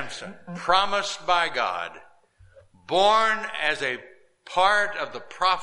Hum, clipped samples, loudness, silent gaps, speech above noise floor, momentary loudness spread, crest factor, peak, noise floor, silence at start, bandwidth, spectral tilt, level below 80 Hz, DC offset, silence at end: none; under 0.1%; -23 LUFS; none; 31 dB; 15 LU; 20 dB; -6 dBFS; -55 dBFS; 0 s; 11.5 kHz; -2 dB/octave; -56 dBFS; under 0.1%; 0 s